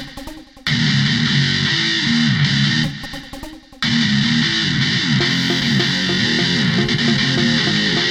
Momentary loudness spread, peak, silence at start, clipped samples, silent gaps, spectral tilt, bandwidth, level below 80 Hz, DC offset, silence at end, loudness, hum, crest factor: 14 LU; -4 dBFS; 0 s; under 0.1%; none; -4 dB/octave; 13 kHz; -42 dBFS; under 0.1%; 0 s; -16 LUFS; none; 14 dB